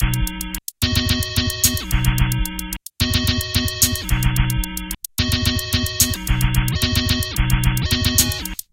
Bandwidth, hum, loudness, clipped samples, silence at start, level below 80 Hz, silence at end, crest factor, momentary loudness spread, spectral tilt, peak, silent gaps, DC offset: 17.5 kHz; none; -19 LUFS; under 0.1%; 0 s; -24 dBFS; 0.2 s; 20 dB; 9 LU; -3 dB/octave; 0 dBFS; none; under 0.1%